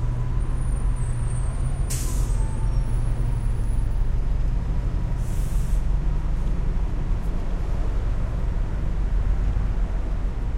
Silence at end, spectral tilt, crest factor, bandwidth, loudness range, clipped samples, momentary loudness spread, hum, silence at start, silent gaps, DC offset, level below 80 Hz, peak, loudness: 0 s; -6.5 dB/octave; 10 dB; 13.5 kHz; 1 LU; under 0.1%; 2 LU; none; 0 s; none; under 0.1%; -22 dBFS; -12 dBFS; -27 LUFS